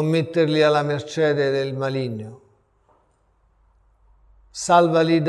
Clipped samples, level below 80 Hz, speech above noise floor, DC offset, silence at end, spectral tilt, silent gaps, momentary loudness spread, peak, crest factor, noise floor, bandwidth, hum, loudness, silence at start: under 0.1%; -60 dBFS; 43 dB; under 0.1%; 0 s; -5.5 dB/octave; none; 14 LU; -4 dBFS; 18 dB; -62 dBFS; 12 kHz; none; -20 LUFS; 0 s